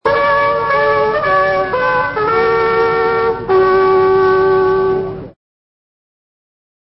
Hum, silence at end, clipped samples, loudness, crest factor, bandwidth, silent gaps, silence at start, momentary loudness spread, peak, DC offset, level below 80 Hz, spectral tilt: none; 1.55 s; under 0.1%; -13 LUFS; 12 dB; 5.8 kHz; none; 0.05 s; 4 LU; -2 dBFS; under 0.1%; -42 dBFS; -9.5 dB/octave